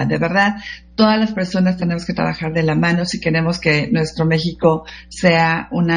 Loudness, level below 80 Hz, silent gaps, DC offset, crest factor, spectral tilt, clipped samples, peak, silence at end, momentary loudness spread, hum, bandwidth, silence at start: -17 LUFS; -44 dBFS; none; under 0.1%; 16 dB; -6 dB/octave; under 0.1%; 0 dBFS; 0 s; 6 LU; none; 10 kHz; 0 s